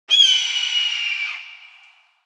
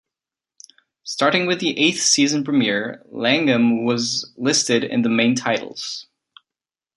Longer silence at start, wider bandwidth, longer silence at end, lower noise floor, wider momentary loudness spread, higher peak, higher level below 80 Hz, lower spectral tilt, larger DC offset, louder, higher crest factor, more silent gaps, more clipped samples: second, 0.1 s vs 1.05 s; about the same, 10.5 kHz vs 11.5 kHz; second, 0.6 s vs 0.95 s; second, -52 dBFS vs -90 dBFS; about the same, 14 LU vs 13 LU; about the same, -4 dBFS vs -2 dBFS; second, under -90 dBFS vs -66 dBFS; second, 8.5 dB/octave vs -3 dB/octave; neither; about the same, -17 LUFS vs -19 LUFS; about the same, 18 dB vs 18 dB; neither; neither